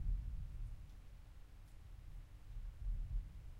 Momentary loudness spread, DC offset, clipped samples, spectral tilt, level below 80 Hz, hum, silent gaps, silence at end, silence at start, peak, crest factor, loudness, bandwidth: 14 LU; under 0.1%; under 0.1%; -7 dB/octave; -46 dBFS; none; none; 0 s; 0 s; -30 dBFS; 16 dB; -52 LUFS; 5.8 kHz